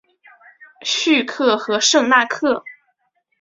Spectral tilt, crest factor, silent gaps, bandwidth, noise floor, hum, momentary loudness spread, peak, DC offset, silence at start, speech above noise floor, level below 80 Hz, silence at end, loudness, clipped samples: -1 dB/octave; 18 dB; none; 7.8 kHz; -68 dBFS; none; 8 LU; -2 dBFS; under 0.1%; 0.85 s; 51 dB; -66 dBFS; 0.7 s; -17 LUFS; under 0.1%